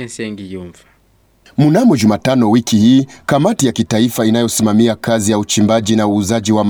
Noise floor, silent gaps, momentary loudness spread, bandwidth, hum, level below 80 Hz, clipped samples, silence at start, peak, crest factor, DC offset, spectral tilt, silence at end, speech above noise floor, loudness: -53 dBFS; none; 13 LU; 19.5 kHz; none; -48 dBFS; under 0.1%; 0 s; 0 dBFS; 12 dB; under 0.1%; -5.5 dB/octave; 0 s; 41 dB; -13 LUFS